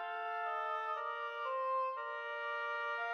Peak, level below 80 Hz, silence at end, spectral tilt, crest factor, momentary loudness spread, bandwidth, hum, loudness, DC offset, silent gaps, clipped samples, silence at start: -28 dBFS; under -90 dBFS; 0 s; 0.5 dB/octave; 12 dB; 4 LU; 14.5 kHz; none; -39 LUFS; under 0.1%; none; under 0.1%; 0 s